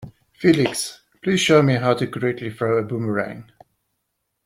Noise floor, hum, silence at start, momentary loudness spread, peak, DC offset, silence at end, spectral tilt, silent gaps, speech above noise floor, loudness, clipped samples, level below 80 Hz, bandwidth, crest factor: -76 dBFS; none; 0 s; 13 LU; -2 dBFS; under 0.1%; 1.05 s; -5 dB/octave; none; 56 dB; -20 LUFS; under 0.1%; -58 dBFS; 16 kHz; 18 dB